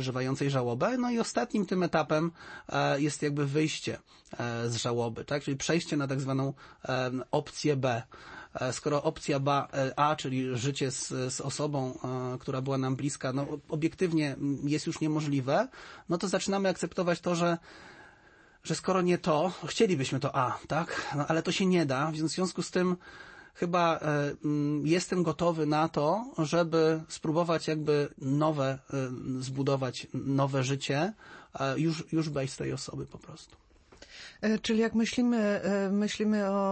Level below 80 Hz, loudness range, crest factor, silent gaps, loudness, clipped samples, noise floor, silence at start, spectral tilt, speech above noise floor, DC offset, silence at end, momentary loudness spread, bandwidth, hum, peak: -64 dBFS; 4 LU; 18 dB; none; -30 LUFS; under 0.1%; -59 dBFS; 0 s; -5.5 dB/octave; 29 dB; under 0.1%; 0 s; 8 LU; 8.8 kHz; none; -12 dBFS